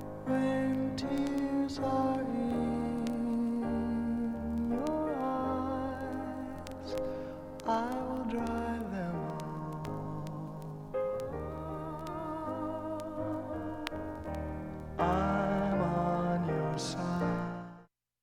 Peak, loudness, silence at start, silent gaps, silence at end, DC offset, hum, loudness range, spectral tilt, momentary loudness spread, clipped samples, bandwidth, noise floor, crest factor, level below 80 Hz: -14 dBFS; -35 LUFS; 0 s; none; 0.35 s; under 0.1%; none; 6 LU; -7 dB/octave; 9 LU; under 0.1%; 15.5 kHz; -58 dBFS; 20 dB; -52 dBFS